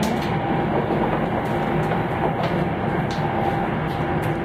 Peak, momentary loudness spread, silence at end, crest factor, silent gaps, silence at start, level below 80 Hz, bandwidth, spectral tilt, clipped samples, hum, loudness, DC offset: -8 dBFS; 2 LU; 0 s; 14 dB; none; 0 s; -40 dBFS; 16 kHz; -7 dB/octave; under 0.1%; none; -23 LUFS; under 0.1%